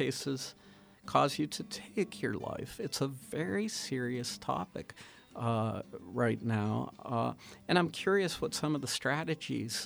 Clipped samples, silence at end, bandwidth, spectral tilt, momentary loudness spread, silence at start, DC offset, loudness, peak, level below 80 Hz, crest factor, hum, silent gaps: under 0.1%; 0 s; over 20 kHz; -4.5 dB/octave; 11 LU; 0 s; under 0.1%; -34 LUFS; -14 dBFS; -66 dBFS; 22 dB; none; none